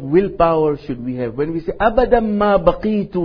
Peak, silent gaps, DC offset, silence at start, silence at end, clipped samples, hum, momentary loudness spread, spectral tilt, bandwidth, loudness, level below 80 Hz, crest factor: 0 dBFS; none; under 0.1%; 0 s; 0 s; under 0.1%; none; 9 LU; -10 dB/octave; 5.4 kHz; -17 LUFS; -32 dBFS; 16 dB